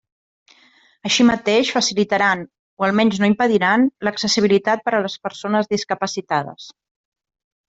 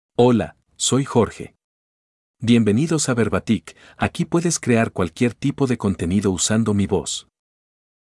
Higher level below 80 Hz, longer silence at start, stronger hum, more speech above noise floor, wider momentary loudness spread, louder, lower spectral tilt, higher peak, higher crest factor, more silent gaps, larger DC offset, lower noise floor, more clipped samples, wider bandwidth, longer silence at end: second, -58 dBFS vs -52 dBFS; first, 1.05 s vs 0.2 s; neither; second, 36 dB vs over 71 dB; about the same, 10 LU vs 8 LU; about the same, -18 LUFS vs -20 LUFS; about the same, -4 dB/octave vs -5 dB/octave; about the same, -4 dBFS vs -2 dBFS; about the same, 16 dB vs 18 dB; second, 2.59-2.77 s vs 1.64-2.34 s; neither; second, -55 dBFS vs under -90 dBFS; neither; second, 8 kHz vs 12 kHz; about the same, 1 s vs 0.9 s